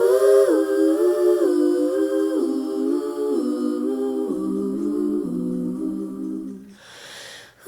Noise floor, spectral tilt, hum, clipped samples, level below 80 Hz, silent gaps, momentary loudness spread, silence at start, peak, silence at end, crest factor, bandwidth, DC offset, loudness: -43 dBFS; -6.5 dB/octave; none; under 0.1%; -62 dBFS; none; 18 LU; 0 s; -6 dBFS; 0.2 s; 14 dB; 18.5 kHz; under 0.1%; -21 LUFS